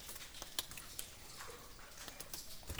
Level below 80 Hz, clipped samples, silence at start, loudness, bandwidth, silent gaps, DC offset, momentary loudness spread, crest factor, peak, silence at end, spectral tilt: -60 dBFS; under 0.1%; 0 s; -48 LUFS; over 20 kHz; none; under 0.1%; 8 LU; 30 dB; -18 dBFS; 0 s; -1.5 dB/octave